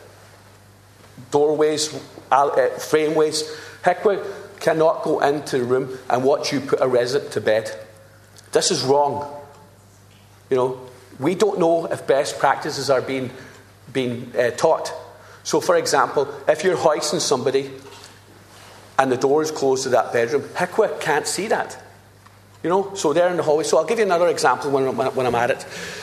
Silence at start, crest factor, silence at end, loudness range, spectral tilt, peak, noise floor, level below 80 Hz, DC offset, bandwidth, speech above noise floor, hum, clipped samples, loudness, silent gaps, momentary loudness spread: 0 s; 22 dB; 0 s; 3 LU; -4 dB/octave; 0 dBFS; -49 dBFS; -62 dBFS; under 0.1%; 14 kHz; 29 dB; none; under 0.1%; -20 LUFS; none; 10 LU